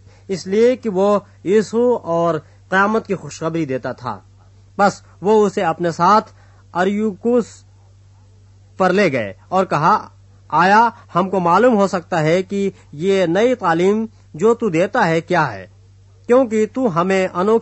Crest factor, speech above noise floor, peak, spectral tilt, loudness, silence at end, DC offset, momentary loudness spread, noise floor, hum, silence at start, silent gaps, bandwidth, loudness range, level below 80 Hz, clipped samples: 16 dB; 30 dB; -2 dBFS; -6 dB/octave; -17 LUFS; 0 s; under 0.1%; 10 LU; -47 dBFS; none; 0.3 s; none; 8.4 kHz; 4 LU; -56 dBFS; under 0.1%